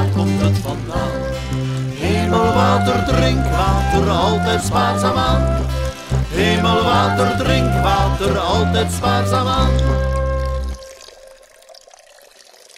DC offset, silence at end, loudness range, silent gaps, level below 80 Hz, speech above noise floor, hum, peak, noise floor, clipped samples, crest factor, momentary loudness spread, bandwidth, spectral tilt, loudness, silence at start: under 0.1%; 1.05 s; 4 LU; none; -24 dBFS; 30 dB; none; 0 dBFS; -46 dBFS; under 0.1%; 16 dB; 8 LU; 15.5 kHz; -6 dB/octave; -17 LUFS; 0 s